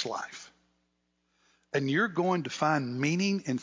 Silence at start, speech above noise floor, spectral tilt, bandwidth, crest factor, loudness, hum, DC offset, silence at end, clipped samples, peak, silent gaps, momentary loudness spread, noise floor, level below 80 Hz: 0 s; 47 dB; -5.5 dB/octave; 7.6 kHz; 18 dB; -29 LUFS; none; under 0.1%; 0 s; under 0.1%; -14 dBFS; none; 10 LU; -77 dBFS; -76 dBFS